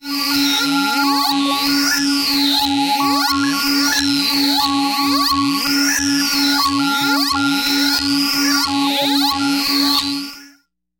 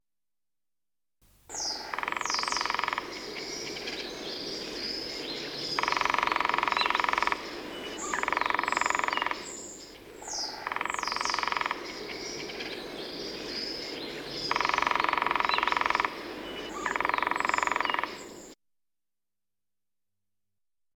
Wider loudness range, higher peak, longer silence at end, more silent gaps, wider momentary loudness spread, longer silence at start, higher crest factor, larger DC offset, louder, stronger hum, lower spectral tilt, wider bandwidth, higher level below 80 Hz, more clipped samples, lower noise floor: second, 0 LU vs 5 LU; first, -4 dBFS vs -10 dBFS; second, 0.5 s vs 2.4 s; neither; second, 2 LU vs 11 LU; second, 0.05 s vs 1.5 s; second, 14 dB vs 22 dB; neither; first, -15 LUFS vs -30 LUFS; neither; about the same, -1.5 dB/octave vs -1.5 dB/octave; second, 17 kHz vs 19.5 kHz; first, -50 dBFS vs -60 dBFS; neither; second, -54 dBFS vs under -90 dBFS